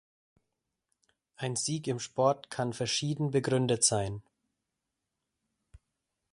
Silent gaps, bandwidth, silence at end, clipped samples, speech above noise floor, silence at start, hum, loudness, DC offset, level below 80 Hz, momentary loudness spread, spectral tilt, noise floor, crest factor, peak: none; 11.5 kHz; 2.1 s; under 0.1%; 56 dB; 1.4 s; none; -30 LUFS; under 0.1%; -64 dBFS; 10 LU; -4 dB/octave; -86 dBFS; 22 dB; -12 dBFS